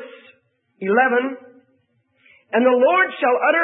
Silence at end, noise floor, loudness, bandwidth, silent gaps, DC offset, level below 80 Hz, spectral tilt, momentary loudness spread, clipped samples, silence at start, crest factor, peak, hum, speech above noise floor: 0 s; -64 dBFS; -18 LUFS; 4 kHz; none; under 0.1%; -80 dBFS; -9.5 dB/octave; 14 LU; under 0.1%; 0 s; 16 dB; -4 dBFS; none; 47 dB